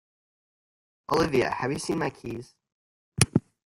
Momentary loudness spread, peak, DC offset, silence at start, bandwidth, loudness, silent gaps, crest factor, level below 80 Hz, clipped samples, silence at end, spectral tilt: 16 LU; 0 dBFS; under 0.1%; 1.1 s; 16 kHz; -26 LUFS; 2.72-3.12 s; 30 dB; -54 dBFS; under 0.1%; 0.25 s; -4.5 dB/octave